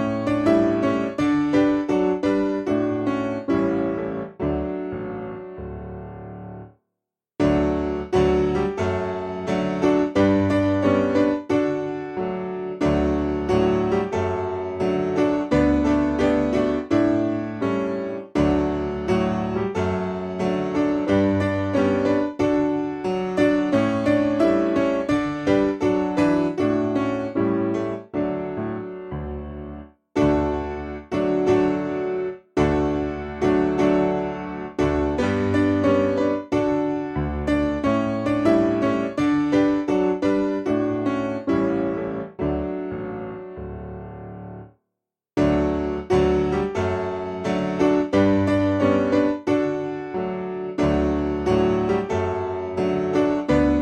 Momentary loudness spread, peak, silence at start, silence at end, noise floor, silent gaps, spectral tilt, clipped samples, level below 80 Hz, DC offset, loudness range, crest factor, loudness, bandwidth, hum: 10 LU; -6 dBFS; 0 s; 0 s; -84 dBFS; none; -7.5 dB/octave; under 0.1%; -40 dBFS; under 0.1%; 5 LU; 16 dB; -22 LUFS; 8.8 kHz; none